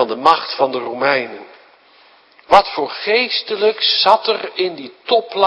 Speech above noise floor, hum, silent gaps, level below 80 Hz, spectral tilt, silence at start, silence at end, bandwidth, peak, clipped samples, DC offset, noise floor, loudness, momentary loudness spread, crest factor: 33 dB; none; none; -56 dBFS; -4 dB/octave; 0 s; 0 s; 11 kHz; 0 dBFS; 0.2%; under 0.1%; -49 dBFS; -16 LUFS; 9 LU; 16 dB